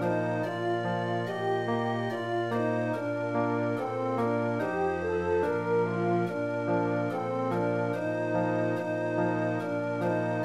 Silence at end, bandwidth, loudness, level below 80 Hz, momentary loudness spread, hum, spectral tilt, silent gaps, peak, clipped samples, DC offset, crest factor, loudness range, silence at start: 0 s; 12.5 kHz; -30 LUFS; -64 dBFS; 3 LU; none; -8 dB/octave; none; -16 dBFS; under 0.1%; 0.1%; 12 dB; 1 LU; 0 s